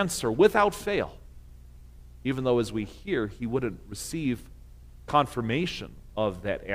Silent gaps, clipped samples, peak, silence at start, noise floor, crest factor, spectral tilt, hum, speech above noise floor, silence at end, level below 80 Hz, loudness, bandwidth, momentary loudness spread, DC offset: none; under 0.1%; -8 dBFS; 0 s; -48 dBFS; 20 dB; -5 dB/octave; 60 Hz at -50 dBFS; 21 dB; 0 s; -48 dBFS; -28 LUFS; 16 kHz; 14 LU; under 0.1%